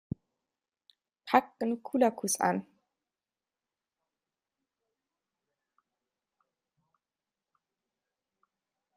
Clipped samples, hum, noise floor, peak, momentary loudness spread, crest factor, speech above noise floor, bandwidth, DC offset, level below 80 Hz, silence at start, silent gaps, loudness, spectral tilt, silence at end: under 0.1%; none; under -90 dBFS; -6 dBFS; 16 LU; 30 dB; over 61 dB; 13.5 kHz; under 0.1%; -74 dBFS; 1.25 s; none; -30 LUFS; -4 dB/octave; 6.35 s